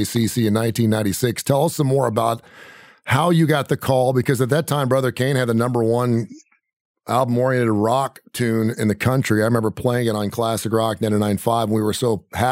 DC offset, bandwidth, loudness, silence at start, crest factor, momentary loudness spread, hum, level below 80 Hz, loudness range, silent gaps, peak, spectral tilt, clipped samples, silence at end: under 0.1%; 16 kHz; -20 LUFS; 0 s; 18 dB; 4 LU; none; -54 dBFS; 2 LU; 6.73-6.95 s; -2 dBFS; -6 dB/octave; under 0.1%; 0 s